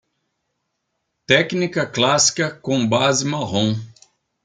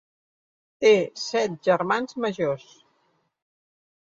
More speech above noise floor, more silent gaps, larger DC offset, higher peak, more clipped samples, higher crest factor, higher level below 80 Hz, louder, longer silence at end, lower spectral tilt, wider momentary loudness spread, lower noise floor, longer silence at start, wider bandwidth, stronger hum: first, 56 dB vs 46 dB; neither; neither; first, -2 dBFS vs -6 dBFS; neither; about the same, 20 dB vs 20 dB; first, -60 dBFS vs -72 dBFS; first, -18 LUFS vs -24 LUFS; second, 0.55 s vs 1.6 s; about the same, -3.5 dB/octave vs -4.5 dB/octave; about the same, 7 LU vs 9 LU; first, -75 dBFS vs -69 dBFS; first, 1.3 s vs 0.8 s; first, 11 kHz vs 7.8 kHz; neither